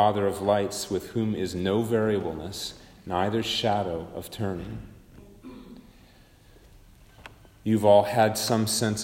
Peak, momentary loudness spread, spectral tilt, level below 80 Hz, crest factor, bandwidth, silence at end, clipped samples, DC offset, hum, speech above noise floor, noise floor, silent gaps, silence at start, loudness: -6 dBFS; 18 LU; -5 dB/octave; -54 dBFS; 20 dB; 16 kHz; 0 s; under 0.1%; under 0.1%; none; 29 dB; -54 dBFS; none; 0 s; -26 LUFS